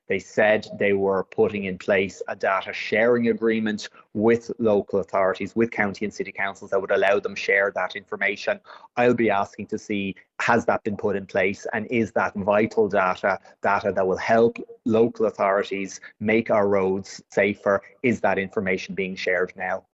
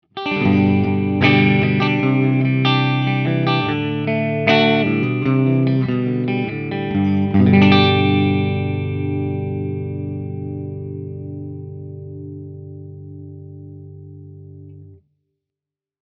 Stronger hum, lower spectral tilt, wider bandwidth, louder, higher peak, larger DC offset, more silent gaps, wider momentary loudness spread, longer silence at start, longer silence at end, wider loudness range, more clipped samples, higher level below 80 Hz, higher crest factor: second, none vs 50 Hz at -45 dBFS; second, -6 dB/octave vs -8.5 dB/octave; first, 8 kHz vs 6.2 kHz; second, -23 LUFS vs -17 LUFS; second, -4 dBFS vs 0 dBFS; neither; neither; second, 8 LU vs 22 LU; about the same, 0.1 s vs 0.15 s; second, 0.15 s vs 1.1 s; second, 2 LU vs 19 LU; neither; second, -62 dBFS vs -54 dBFS; about the same, 18 dB vs 18 dB